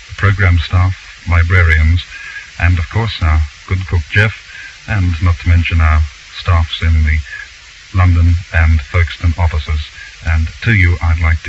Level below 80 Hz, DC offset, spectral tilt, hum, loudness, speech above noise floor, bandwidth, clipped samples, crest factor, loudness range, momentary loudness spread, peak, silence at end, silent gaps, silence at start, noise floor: -18 dBFS; under 0.1%; -6.5 dB/octave; none; -14 LUFS; 25 dB; 7.6 kHz; under 0.1%; 12 dB; 2 LU; 13 LU; 0 dBFS; 0 s; none; 0 s; -36 dBFS